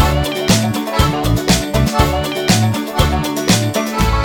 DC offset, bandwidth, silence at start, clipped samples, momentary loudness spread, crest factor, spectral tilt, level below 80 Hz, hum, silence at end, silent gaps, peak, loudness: under 0.1%; over 20 kHz; 0 s; under 0.1%; 3 LU; 14 dB; -4.5 dB/octave; -22 dBFS; none; 0 s; none; 0 dBFS; -15 LUFS